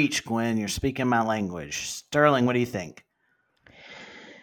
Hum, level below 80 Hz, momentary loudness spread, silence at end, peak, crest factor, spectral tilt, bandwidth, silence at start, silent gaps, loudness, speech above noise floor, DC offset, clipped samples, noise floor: none; -54 dBFS; 22 LU; 0.05 s; -4 dBFS; 22 dB; -4.5 dB/octave; 18 kHz; 0 s; none; -25 LUFS; 46 dB; under 0.1%; under 0.1%; -71 dBFS